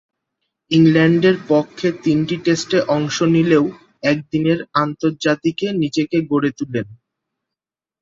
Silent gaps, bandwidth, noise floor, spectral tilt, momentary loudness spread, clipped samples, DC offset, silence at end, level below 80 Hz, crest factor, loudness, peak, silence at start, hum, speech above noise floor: none; 7.8 kHz; -87 dBFS; -6 dB/octave; 8 LU; under 0.1%; under 0.1%; 1.05 s; -58 dBFS; 16 dB; -17 LUFS; -2 dBFS; 0.7 s; none; 70 dB